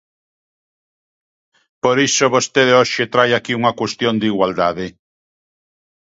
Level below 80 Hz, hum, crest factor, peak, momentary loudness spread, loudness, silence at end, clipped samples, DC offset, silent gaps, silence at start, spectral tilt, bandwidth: -56 dBFS; none; 18 dB; 0 dBFS; 7 LU; -15 LUFS; 1.25 s; under 0.1%; under 0.1%; none; 1.85 s; -3.5 dB/octave; 8 kHz